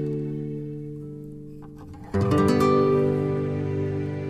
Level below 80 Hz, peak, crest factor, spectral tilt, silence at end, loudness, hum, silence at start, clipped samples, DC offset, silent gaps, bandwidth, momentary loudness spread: -50 dBFS; -10 dBFS; 16 dB; -8 dB/octave; 0 s; -24 LUFS; none; 0 s; under 0.1%; under 0.1%; none; 13.5 kHz; 21 LU